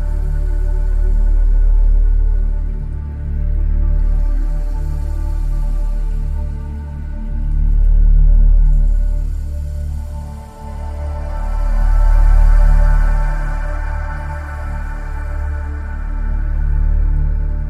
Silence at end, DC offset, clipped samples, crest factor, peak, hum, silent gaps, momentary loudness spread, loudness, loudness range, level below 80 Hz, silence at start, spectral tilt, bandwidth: 0 s; under 0.1%; under 0.1%; 12 dB; -2 dBFS; none; none; 11 LU; -20 LUFS; 5 LU; -14 dBFS; 0 s; -8 dB/octave; 2.5 kHz